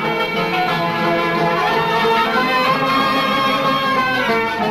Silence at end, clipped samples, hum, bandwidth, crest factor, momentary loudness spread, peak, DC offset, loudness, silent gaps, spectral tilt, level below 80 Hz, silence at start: 0 s; under 0.1%; none; 14 kHz; 12 dB; 2 LU; -6 dBFS; under 0.1%; -16 LUFS; none; -5 dB/octave; -48 dBFS; 0 s